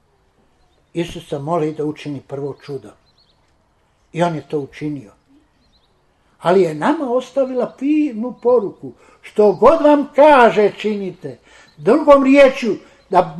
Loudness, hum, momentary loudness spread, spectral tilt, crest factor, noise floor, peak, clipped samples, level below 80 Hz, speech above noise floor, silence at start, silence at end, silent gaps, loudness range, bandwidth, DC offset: -15 LUFS; none; 19 LU; -6.5 dB/octave; 16 dB; -59 dBFS; 0 dBFS; under 0.1%; -50 dBFS; 44 dB; 0.95 s; 0 s; none; 13 LU; 11.5 kHz; under 0.1%